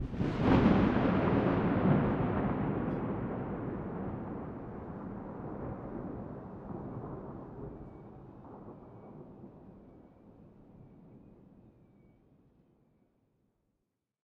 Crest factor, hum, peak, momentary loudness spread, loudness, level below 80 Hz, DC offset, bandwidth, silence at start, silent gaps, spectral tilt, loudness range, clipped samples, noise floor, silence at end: 24 dB; none; -12 dBFS; 23 LU; -33 LUFS; -50 dBFS; under 0.1%; 6.6 kHz; 0 s; none; -9.5 dB/octave; 24 LU; under 0.1%; -84 dBFS; 2.55 s